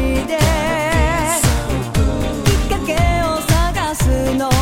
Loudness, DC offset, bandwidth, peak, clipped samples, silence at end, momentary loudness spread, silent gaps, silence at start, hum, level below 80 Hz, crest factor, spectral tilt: -17 LUFS; 1%; 16.5 kHz; -2 dBFS; under 0.1%; 0 s; 3 LU; none; 0 s; none; -22 dBFS; 12 dB; -5 dB/octave